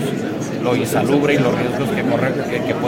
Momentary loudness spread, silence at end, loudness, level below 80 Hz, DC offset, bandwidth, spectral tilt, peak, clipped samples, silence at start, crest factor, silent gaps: 6 LU; 0 s; -18 LUFS; -50 dBFS; under 0.1%; 16.5 kHz; -6 dB/octave; -2 dBFS; under 0.1%; 0 s; 16 dB; none